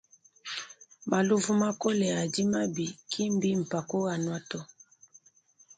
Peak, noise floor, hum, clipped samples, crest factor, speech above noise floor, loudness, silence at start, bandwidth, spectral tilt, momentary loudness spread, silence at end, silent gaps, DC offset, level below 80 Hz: -14 dBFS; -63 dBFS; none; under 0.1%; 18 dB; 34 dB; -30 LUFS; 0.45 s; 9.4 kHz; -5 dB/octave; 14 LU; 1.15 s; none; under 0.1%; -70 dBFS